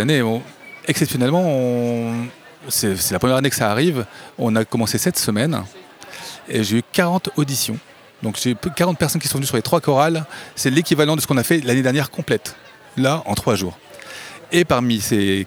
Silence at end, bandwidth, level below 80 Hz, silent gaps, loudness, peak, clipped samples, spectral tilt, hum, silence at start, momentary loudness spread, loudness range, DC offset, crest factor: 0 s; over 20 kHz; -52 dBFS; none; -19 LUFS; -2 dBFS; under 0.1%; -4.5 dB/octave; none; 0 s; 15 LU; 3 LU; under 0.1%; 18 dB